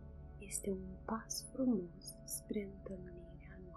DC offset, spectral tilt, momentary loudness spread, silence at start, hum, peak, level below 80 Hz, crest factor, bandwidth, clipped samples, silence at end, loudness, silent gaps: under 0.1%; -4.5 dB/octave; 17 LU; 0 s; none; -26 dBFS; -58 dBFS; 18 dB; 13 kHz; under 0.1%; 0 s; -42 LUFS; none